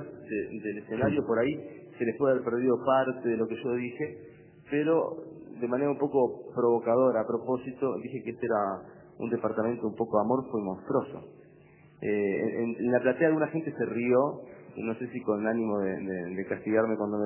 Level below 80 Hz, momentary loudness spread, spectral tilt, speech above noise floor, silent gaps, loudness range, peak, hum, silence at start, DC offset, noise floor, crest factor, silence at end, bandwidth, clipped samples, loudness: -66 dBFS; 11 LU; -11 dB/octave; 27 dB; none; 3 LU; -10 dBFS; none; 0 s; under 0.1%; -56 dBFS; 18 dB; 0 s; 3.2 kHz; under 0.1%; -29 LUFS